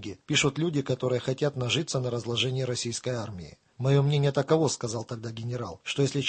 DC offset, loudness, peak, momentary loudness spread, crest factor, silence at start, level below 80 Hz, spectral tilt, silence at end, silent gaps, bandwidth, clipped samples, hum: under 0.1%; -28 LUFS; -8 dBFS; 10 LU; 20 dB; 0 s; -60 dBFS; -5 dB/octave; 0 s; none; 8.8 kHz; under 0.1%; none